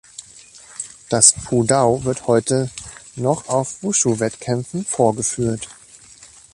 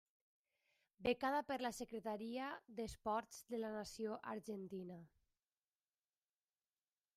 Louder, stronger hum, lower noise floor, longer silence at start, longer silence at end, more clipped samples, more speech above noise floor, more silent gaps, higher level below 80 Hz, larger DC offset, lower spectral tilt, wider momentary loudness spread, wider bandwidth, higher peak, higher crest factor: first, -18 LUFS vs -45 LUFS; neither; second, -45 dBFS vs under -90 dBFS; second, 0.2 s vs 1 s; second, 0.3 s vs 2.1 s; neither; second, 27 dB vs over 45 dB; neither; first, -50 dBFS vs -74 dBFS; neither; about the same, -4 dB/octave vs -4.5 dB/octave; first, 21 LU vs 9 LU; second, 13 kHz vs 15.5 kHz; first, 0 dBFS vs -26 dBFS; about the same, 20 dB vs 22 dB